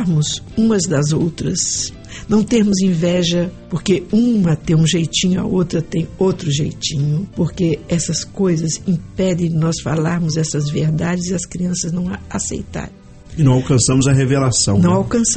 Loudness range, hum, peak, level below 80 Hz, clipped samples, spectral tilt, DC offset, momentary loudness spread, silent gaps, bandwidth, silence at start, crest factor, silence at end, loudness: 3 LU; none; -2 dBFS; -38 dBFS; under 0.1%; -5 dB/octave; under 0.1%; 8 LU; none; 8.8 kHz; 0 s; 14 dB; 0 s; -17 LUFS